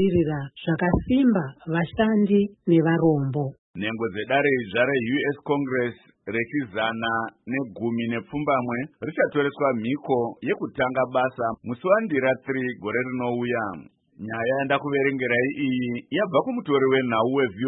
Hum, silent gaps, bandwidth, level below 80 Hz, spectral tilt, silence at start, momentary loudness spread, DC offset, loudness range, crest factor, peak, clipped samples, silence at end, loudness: none; 3.58-3.74 s; 4 kHz; -50 dBFS; -11.5 dB/octave; 0 s; 9 LU; under 0.1%; 4 LU; 16 dB; -6 dBFS; under 0.1%; 0 s; -24 LUFS